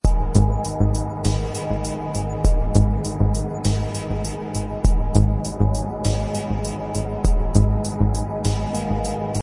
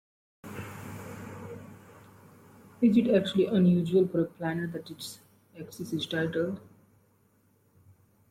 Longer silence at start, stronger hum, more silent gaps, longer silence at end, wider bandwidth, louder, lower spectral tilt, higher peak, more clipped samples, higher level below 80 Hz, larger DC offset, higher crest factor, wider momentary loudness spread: second, 0.05 s vs 0.45 s; neither; neither; second, 0 s vs 1.7 s; second, 11.5 kHz vs 15.5 kHz; first, -22 LUFS vs -27 LUFS; about the same, -6.5 dB/octave vs -7 dB/octave; first, -2 dBFS vs -12 dBFS; neither; first, -24 dBFS vs -68 dBFS; neither; about the same, 18 dB vs 18 dB; second, 7 LU vs 21 LU